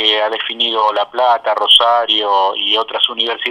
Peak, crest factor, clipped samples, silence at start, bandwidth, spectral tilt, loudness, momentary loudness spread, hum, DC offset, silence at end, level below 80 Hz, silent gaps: 0 dBFS; 14 dB; under 0.1%; 0 s; over 20 kHz; -0.5 dB/octave; -13 LUFS; 7 LU; none; under 0.1%; 0 s; -62 dBFS; none